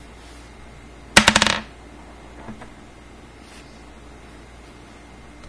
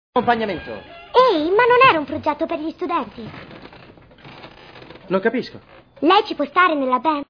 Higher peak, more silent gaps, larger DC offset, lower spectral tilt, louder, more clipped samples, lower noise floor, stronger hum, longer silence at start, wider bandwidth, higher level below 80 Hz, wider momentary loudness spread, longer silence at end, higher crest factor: about the same, 0 dBFS vs -2 dBFS; neither; neither; second, -2 dB/octave vs -6.5 dB/octave; about the same, -16 LUFS vs -18 LUFS; neither; about the same, -43 dBFS vs -45 dBFS; neither; first, 1.15 s vs 0.15 s; first, 11 kHz vs 5.4 kHz; first, -44 dBFS vs -54 dBFS; first, 29 LU vs 20 LU; first, 2.85 s vs 0.05 s; first, 26 dB vs 18 dB